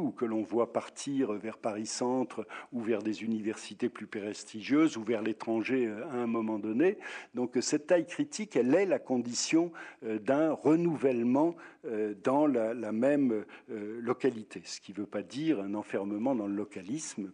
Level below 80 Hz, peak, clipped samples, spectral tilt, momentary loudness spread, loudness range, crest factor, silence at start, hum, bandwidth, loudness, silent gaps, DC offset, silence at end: -84 dBFS; -14 dBFS; under 0.1%; -5 dB/octave; 11 LU; 5 LU; 16 dB; 0 s; none; 10 kHz; -32 LUFS; none; under 0.1%; 0 s